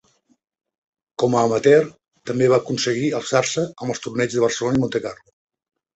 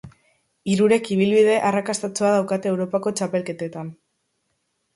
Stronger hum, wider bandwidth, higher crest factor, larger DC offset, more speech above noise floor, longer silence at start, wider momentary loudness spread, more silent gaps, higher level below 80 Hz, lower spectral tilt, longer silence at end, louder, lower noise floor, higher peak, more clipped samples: neither; second, 8.2 kHz vs 11.5 kHz; about the same, 18 dB vs 16 dB; neither; second, 45 dB vs 52 dB; first, 1.2 s vs 0.05 s; about the same, 12 LU vs 14 LU; neither; first, -58 dBFS vs -64 dBFS; about the same, -5 dB/octave vs -5.5 dB/octave; second, 0.8 s vs 1.05 s; about the same, -20 LUFS vs -21 LUFS; second, -65 dBFS vs -72 dBFS; about the same, -4 dBFS vs -6 dBFS; neither